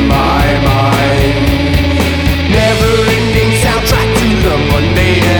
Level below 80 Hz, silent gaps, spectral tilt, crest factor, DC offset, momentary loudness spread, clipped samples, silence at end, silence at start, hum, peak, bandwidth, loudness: -18 dBFS; none; -5.5 dB/octave; 10 dB; under 0.1%; 2 LU; under 0.1%; 0 s; 0 s; none; 0 dBFS; over 20 kHz; -10 LUFS